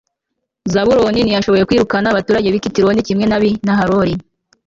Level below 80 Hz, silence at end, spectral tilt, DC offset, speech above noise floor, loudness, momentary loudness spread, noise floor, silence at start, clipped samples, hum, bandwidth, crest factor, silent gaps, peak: -40 dBFS; 0.45 s; -6 dB/octave; under 0.1%; 62 dB; -14 LUFS; 4 LU; -75 dBFS; 0.65 s; under 0.1%; none; 7.6 kHz; 12 dB; none; -2 dBFS